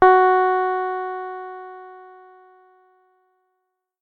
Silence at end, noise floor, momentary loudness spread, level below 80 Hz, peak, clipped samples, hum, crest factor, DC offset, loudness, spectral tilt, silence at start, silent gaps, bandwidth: 2 s; -76 dBFS; 24 LU; -58 dBFS; 0 dBFS; under 0.1%; none; 22 dB; under 0.1%; -19 LUFS; -7 dB/octave; 0 s; none; 4.7 kHz